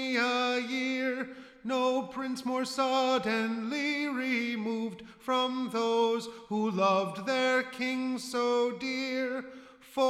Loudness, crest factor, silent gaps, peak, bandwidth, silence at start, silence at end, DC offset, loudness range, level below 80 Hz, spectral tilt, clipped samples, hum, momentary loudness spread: -30 LUFS; 16 dB; none; -16 dBFS; 15 kHz; 0 s; 0 s; under 0.1%; 1 LU; -74 dBFS; -4 dB/octave; under 0.1%; none; 9 LU